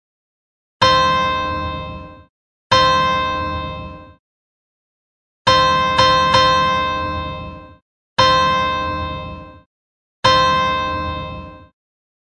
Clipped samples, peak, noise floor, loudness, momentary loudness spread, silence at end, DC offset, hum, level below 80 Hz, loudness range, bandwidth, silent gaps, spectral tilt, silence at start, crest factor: under 0.1%; 0 dBFS; under -90 dBFS; -16 LUFS; 18 LU; 0.65 s; under 0.1%; none; -40 dBFS; 4 LU; 9.8 kHz; 2.29-2.70 s, 4.19-5.45 s, 7.82-8.16 s, 9.66-10.23 s; -3.5 dB/octave; 0.8 s; 18 dB